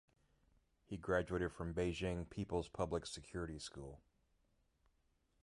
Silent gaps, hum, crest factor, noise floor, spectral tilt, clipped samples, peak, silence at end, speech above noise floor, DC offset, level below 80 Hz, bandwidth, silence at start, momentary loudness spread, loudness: none; none; 20 dB; -79 dBFS; -5.5 dB/octave; under 0.1%; -24 dBFS; 1.45 s; 37 dB; under 0.1%; -58 dBFS; 11.5 kHz; 0.9 s; 11 LU; -43 LUFS